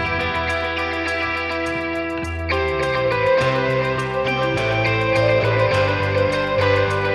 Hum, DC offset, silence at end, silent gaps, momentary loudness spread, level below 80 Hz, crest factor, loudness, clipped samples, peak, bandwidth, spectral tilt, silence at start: none; under 0.1%; 0 s; none; 5 LU; -40 dBFS; 14 dB; -19 LUFS; under 0.1%; -6 dBFS; 12 kHz; -6 dB/octave; 0 s